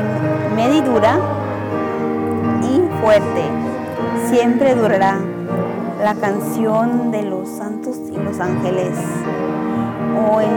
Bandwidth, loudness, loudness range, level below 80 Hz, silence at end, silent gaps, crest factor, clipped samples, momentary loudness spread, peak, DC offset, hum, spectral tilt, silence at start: 18.5 kHz; -18 LUFS; 4 LU; -54 dBFS; 0 s; none; 12 dB; under 0.1%; 9 LU; -6 dBFS; under 0.1%; none; -7 dB/octave; 0 s